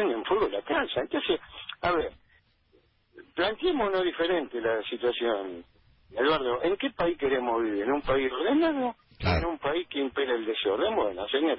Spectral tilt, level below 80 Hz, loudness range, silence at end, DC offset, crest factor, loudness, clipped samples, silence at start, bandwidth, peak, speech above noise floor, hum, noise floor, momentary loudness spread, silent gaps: -9.5 dB/octave; -48 dBFS; 3 LU; 0 s; under 0.1%; 16 dB; -28 LUFS; under 0.1%; 0 s; 5.8 kHz; -14 dBFS; 38 dB; none; -65 dBFS; 5 LU; none